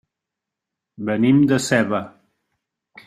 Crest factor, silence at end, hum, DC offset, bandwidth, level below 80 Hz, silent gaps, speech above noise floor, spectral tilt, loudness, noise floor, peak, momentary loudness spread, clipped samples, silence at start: 20 dB; 1 s; none; under 0.1%; 14 kHz; -60 dBFS; none; 67 dB; -5.5 dB/octave; -18 LUFS; -84 dBFS; -2 dBFS; 14 LU; under 0.1%; 1 s